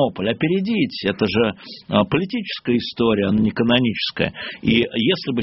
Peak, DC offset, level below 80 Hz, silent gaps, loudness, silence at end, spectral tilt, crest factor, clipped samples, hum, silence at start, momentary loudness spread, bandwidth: 0 dBFS; under 0.1%; -48 dBFS; none; -20 LUFS; 0 s; -4 dB/octave; 20 dB; under 0.1%; none; 0 s; 6 LU; 6 kHz